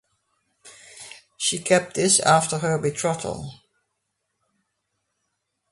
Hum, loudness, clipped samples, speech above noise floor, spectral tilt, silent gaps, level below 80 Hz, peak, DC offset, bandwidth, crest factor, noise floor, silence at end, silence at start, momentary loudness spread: none; -21 LUFS; under 0.1%; 56 dB; -3 dB/octave; none; -60 dBFS; -4 dBFS; under 0.1%; 11.5 kHz; 22 dB; -77 dBFS; 2.15 s; 0.65 s; 23 LU